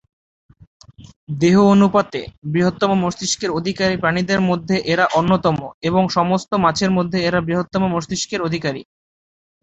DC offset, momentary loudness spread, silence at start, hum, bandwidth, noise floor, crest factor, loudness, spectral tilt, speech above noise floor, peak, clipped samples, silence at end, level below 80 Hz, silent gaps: under 0.1%; 9 LU; 1 s; none; 8.2 kHz; under -90 dBFS; 16 dB; -18 LUFS; -5.5 dB/octave; over 72 dB; -2 dBFS; under 0.1%; 0.8 s; -48 dBFS; 1.16-1.27 s, 2.38-2.42 s, 5.74-5.81 s